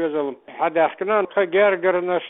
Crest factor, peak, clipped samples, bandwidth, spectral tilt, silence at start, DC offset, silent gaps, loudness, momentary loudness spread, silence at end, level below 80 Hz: 14 dB; -6 dBFS; under 0.1%; 4 kHz; -9.5 dB/octave; 0 s; under 0.1%; none; -20 LUFS; 8 LU; 0 s; -68 dBFS